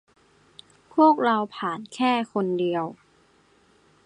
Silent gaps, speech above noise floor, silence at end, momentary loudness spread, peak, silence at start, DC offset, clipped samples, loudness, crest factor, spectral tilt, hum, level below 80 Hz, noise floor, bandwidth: none; 38 dB; 1.1 s; 12 LU; -6 dBFS; 0.95 s; under 0.1%; under 0.1%; -24 LUFS; 20 dB; -6 dB/octave; none; -74 dBFS; -60 dBFS; 10.5 kHz